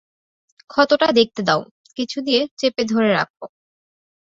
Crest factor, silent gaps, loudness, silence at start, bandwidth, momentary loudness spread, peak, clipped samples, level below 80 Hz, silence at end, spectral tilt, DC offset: 20 dB; 1.71-1.84 s, 2.51-2.57 s, 3.30-3.34 s; -19 LUFS; 0.75 s; 7.8 kHz; 13 LU; -2 dBFS; under 0.1%; -62 dBFS; 0.85 s; -4.5 dB/octave; under 0.1%